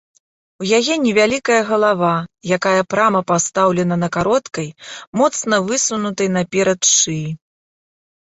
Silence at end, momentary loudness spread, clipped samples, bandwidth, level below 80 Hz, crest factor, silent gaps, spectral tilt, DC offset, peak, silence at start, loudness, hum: 0.9 s; 11 LU; under 0.1%; 8.2 kHz; -56 dBFS; 16 dB; 5.07-5.13 s; -3.5 dB/octave; under 0.1%; -2 dBFS; 0.6 s; -16 LUFS; none